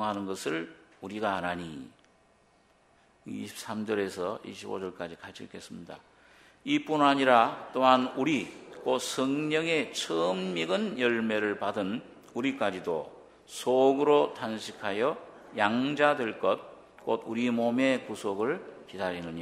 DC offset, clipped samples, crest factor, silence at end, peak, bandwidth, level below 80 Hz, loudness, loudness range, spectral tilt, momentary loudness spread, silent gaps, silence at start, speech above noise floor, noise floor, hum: under 0.1%; under 0.1%; 24 dB; 0 s; -6 dBFS; 15 kHz; -72 dBFS; -29 LUFS; 10 LU; -4.5 dB/octave; 18 LU; none; 0 s; 36 dB; -64 dBFS; none